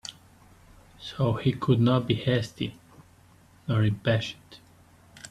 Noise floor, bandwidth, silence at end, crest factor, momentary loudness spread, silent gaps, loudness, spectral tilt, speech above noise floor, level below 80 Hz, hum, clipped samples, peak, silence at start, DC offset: -56 dBFS; 12 kHz; 0.05 s; 20 dB; 19 LU; none; -26 LUFS; -7 dB/octave; 31 dB; -56 dBFS; none; under 0.1%; -8 dBFS; 0.05 s; under 0.1%